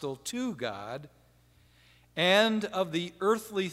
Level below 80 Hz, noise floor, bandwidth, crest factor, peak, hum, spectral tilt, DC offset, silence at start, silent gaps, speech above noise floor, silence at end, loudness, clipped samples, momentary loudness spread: -68 dBFS; -62 dBFS; 16 kHz; 22 dB; -8 dBFS; 60 Hz at -60 dBFS; -4 dB/octave; under 0.1%; 0 s; none; 33 dB; 0 s; -29 LUFS; under 0.1%; 17 LU